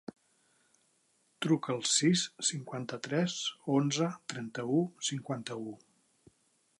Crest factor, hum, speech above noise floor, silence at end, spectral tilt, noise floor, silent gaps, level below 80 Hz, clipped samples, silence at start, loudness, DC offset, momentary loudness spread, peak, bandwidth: 20 dB; none; 40 dB; 1.05 s; -4 dB/octave; -73 dBFS; none; -80 dBFS; under 0.1%; 1.4 s; -32 LUFS; under 0.1%; 13 LU; -16 dBFS; 11.5 kHz